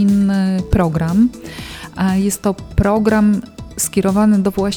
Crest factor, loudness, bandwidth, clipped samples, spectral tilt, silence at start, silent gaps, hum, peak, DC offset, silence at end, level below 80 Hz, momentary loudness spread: 16 dB; -16 LUFS; 18 kHz; under 0.1%; -6 dB/octave; 0 s; none; none; 0 dBFS; under 0.1%; 0 s; -30 dBFS; 14 LU